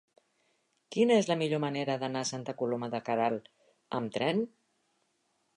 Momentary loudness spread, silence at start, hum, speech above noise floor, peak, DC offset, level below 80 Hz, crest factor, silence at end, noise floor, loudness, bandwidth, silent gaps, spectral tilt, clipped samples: 11 LU; 0.9 s; none; 45 dB; -14 dBFS; under 0.1%; -80 dBFS; 20 dB; 1.1 s; -76 dBFS; -31 LUFS; 11 kHz; none; -5 dB/octave; under 0.1%